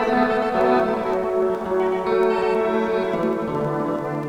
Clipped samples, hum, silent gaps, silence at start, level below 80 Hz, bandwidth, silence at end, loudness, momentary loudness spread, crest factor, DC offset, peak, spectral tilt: under 0.1%; none; none; 0 s; -50 dBFS; 11.5 kHz; 0 s; -21 LUFS; 5 LU; 16 dB; under 0.1%; -6 dBFS; -7 dB/octave